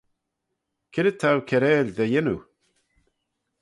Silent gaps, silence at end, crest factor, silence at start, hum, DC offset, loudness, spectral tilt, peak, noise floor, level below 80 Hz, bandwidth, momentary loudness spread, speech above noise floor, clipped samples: none; 1.2 s; 18 dB; 0.95 s; none; under 0.1%; -23 LUFS; -7 dB/octave; -8 dBFS; -80 dBFS; -60 dBFS; 11.5 kHz; 9 LU; 59 dB; under 0.1%